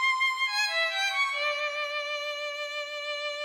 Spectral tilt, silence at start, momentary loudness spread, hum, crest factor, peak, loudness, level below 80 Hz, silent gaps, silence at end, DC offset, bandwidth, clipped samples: 4 dB/octave; 0 s; 8 LU; none; 14 dB; -16 dBFS; -28 LUFS; -78 dBFS; none; 0 s; under 0.1%; 18.5 kHz; under 0.1%